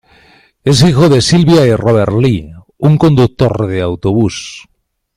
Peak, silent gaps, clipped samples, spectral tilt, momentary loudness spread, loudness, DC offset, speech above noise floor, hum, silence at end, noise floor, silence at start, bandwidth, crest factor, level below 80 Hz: 0 dBFS; none; under 0.1%; -6.5 dB/octave; 9 LU; -11 LUFS; under 0.1%; 37 dB; none; 0.55 s; -46 dBFS; 0.65 s; 14 kHz; 10 dB; -36 dBFS